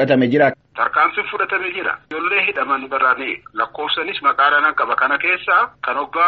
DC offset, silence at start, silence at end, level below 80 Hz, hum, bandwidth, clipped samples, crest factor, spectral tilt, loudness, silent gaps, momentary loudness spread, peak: under 0.1%; 0 s; 0 s; -60 dBFS; none; 6 kHz; under 0.1%; 16 dB; -2 dB/octave; -17 LUFS; none; 9 LU; -2 dBFS